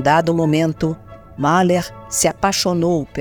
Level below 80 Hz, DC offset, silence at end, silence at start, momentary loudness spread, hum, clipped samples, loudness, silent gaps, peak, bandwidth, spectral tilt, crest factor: -44 dBFS; 0.2%; 0 s; 0 s; 8 LU; none; under 0.1%; -17 LUFS; none; -2 dBFS; over 20 kHz; -4.5 dB/octave; 16 dB